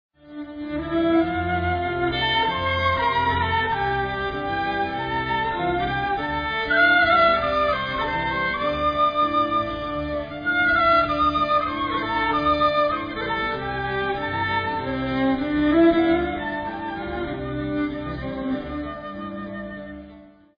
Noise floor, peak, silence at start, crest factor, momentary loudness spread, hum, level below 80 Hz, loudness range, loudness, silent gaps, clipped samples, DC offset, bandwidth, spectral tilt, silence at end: -47 dBFS; -6 dBFS; 0.25 s; 16 dB; 13 LU; none; -42 dBFS; 4 LU; -22 LUFS; none; under 0.1%; under 0.1%; 5.2 kHz; -7.5 dB/octave; 0.3 s